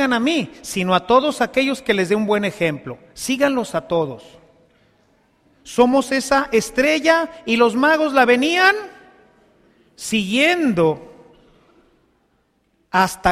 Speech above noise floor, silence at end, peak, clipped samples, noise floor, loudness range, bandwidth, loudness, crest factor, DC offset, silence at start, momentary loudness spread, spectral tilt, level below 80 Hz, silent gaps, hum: 46 dB; 0 s; -2 dBFS; under 0.1%; -64 dBFS; 6 LU; 15.5 kHz; -18 LUFS; 18 dB; under 0.1%; 0 s; 11 LU; -4 dB/octave; -52 dBFS; none; none